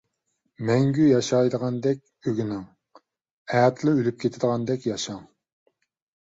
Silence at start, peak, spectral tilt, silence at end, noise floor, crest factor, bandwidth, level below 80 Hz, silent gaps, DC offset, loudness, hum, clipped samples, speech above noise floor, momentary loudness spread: 0.6 s; -8 dBFS; -6.5 dB/octave; 1.05 s; -76 dBFS; 16 dB; 8 kHz; -62 dBFS; 3.31-3.45 s; under 0.1%; -24 LUFS; none; under 0.1%; 53 dB; 12 LU